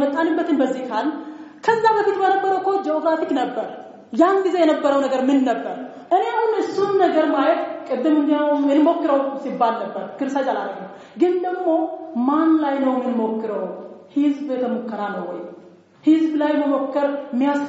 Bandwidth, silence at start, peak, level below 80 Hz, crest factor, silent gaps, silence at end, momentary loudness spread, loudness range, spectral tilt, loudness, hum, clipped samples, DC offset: 8 kHz; 0 s; -4 dBFS; -74 dBFS; 16 dB; none; 0 s; 12 LU; 4 LU; -3.5 dB/octave; -20 LUFS; none; under 0.1%; under 0.1%